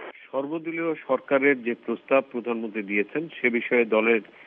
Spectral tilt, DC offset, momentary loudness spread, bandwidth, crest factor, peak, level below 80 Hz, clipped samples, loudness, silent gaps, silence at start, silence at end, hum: -9 dB/octave; under 0.1%; 9 LU; 3.9 kHz; 18 dB; -8 dBFS; -80 dBFS; under 0.1%; -25 LUFS; none; 0 s; 0.05 s; none